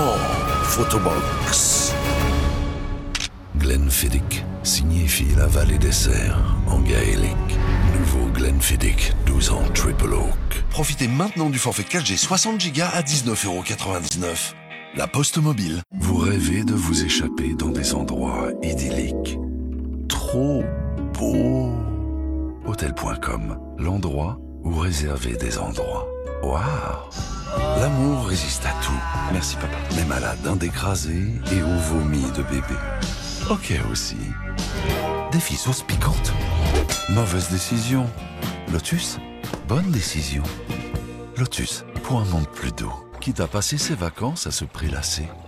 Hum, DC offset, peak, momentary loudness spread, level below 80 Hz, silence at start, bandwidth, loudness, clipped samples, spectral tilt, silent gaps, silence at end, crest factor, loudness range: none; under 0.1%; -4 dBFS; 9 LU; -26 dBFS; 0 s; 16.5 kHz; -22 LUFS; under 0.1%; -4.5 dB/octave; none; 0 s; 16 dB; 6 LU